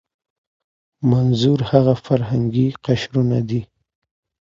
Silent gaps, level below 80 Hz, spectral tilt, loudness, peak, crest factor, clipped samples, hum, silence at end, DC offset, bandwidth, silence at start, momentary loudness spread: none; -48 dBFS; -8 dB/octave; -18 LUFS; 0 dBFS; 18 dB; under 0.1%; none; 0.75 s; under 0.1%; 7.4 kHz; 1 s; 6 LU